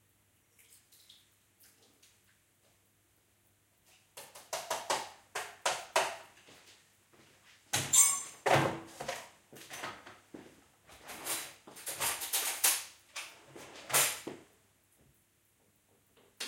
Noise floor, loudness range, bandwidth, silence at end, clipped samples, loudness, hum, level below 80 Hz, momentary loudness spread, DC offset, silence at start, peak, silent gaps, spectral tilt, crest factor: -71 dBFS; 11 LU; 17 kHz; 0 s; under 0.1%; -32 LUFS; none; -74 dBFS; 25 LU; under 0.1%; 4.15 s; -12 dBFS; none; -1 dB/octave; 28 dB